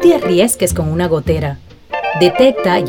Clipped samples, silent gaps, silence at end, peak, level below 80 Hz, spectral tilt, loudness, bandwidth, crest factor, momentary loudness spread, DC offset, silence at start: under 0.1%; none; 0 s; 0 dBFS; -36 dBFS; -5 dB/octave; -14 LUFS; 19 kHz; 12 dB; 12 LU; under 0.1%; 0 s